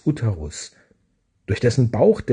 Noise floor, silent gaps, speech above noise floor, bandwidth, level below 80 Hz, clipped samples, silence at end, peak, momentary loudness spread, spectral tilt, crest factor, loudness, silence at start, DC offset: -66 dBFS; none; 47 dB; 10 kHz; -46 dBFS; under 0.1%; 0 s; -4 dBFS; 19 LU; -7 dB/octave; 18 dB; -20 LUFS; 0.05 s; under 0.1%